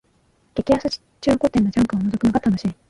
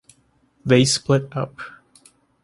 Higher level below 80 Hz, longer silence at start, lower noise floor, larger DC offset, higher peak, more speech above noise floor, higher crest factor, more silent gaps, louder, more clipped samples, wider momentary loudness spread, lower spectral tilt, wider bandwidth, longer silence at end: first, -44 dBFS vs -56 dBFS; about the same, 0.55 s vs 0.65 s; about the same, -61 dBFS vs -61 dBFS; neither; about the same, -4 dBFS vs -2 dBFS; about the same, 42 dB vs 42 dB; about the same, 16 dB vs 20 dB; neither; about the same, -20 LUFS vs -19 LUFS; neither; second, 8 LU vs 20 LU; first, -7 dB/octave vs -5 dB/octave; about the same, 11.5 kHz vs 11.5 kHz; second, 0.15 s vs 0.75 s